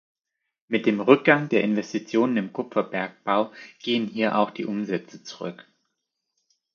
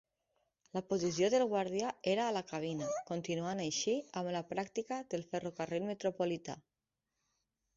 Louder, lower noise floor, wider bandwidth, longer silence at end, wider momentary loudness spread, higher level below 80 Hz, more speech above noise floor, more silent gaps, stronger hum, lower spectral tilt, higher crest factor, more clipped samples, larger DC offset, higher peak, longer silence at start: first, -24 LUFS vs -37 LUFS; second, -80 dBFS vs -89 dBFS; about the same, 7 kHz vs 7.6 kHz; about the same, 1.15 s vs 1.15 s; first, 16 LU vs 8 LU; about the same, -74 dBFS vs -76 dBFS; first, 57 dB vs 53 dB; neither; neither; first, -6 dB/octave vs -4.5 dB/octave; first, 24 dB vs 18 dB; neither; neither; first, -2 dBFS vs -20 dBFS; about the same, 0.7 s vs 0.75 s